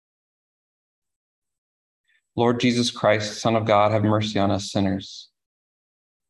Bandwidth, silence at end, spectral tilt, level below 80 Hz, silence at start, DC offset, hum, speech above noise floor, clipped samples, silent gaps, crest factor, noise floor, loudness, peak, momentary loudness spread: 12 kHz; 1.05 s; -5.5 dB/octave; -52 dBFS; 2.35 s; under 0.1%; none; over 69 dB; under 0.1%; none; 20 dB; under -90 dBFS; -22 LUFS; -4 dBFS; 12 LU